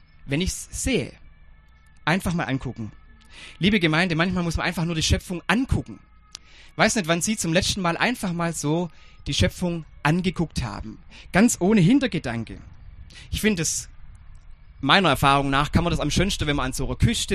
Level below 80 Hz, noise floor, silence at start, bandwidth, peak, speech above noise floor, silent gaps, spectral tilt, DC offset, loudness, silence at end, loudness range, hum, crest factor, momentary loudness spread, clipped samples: -36 dBFS; -51 dBFS; 0.25 s; 13.5 kHz; 0 dBFS; 28 dB; none; -4.5 dB/octave; under 0.1%; -23 LUFS; 0 s; 4 LU; none; 22 dB; 18 LU; under 0.1%